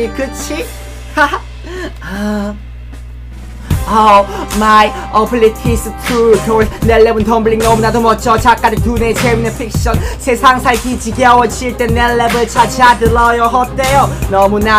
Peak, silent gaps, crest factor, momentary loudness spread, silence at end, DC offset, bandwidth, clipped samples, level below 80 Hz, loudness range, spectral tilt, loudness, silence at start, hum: 0 dBFS; none; 12 dB; 15 LU; 0 s; under 0.1%; 16.5 kHz; 0.3%; -24 dBFS; 5 LU; -5 dB/octave; -11 LUFS; 0 s; none